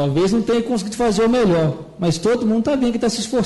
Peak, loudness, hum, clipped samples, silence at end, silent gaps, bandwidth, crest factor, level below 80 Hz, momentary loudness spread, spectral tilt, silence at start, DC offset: -8 dBFS; -18 LUFS; none; under 0.1%; 0 s; none; 11.5 kHz; 10 dB; -44 dBFS; 6 LU; -6 dB/octave; 0 s; under 0.1%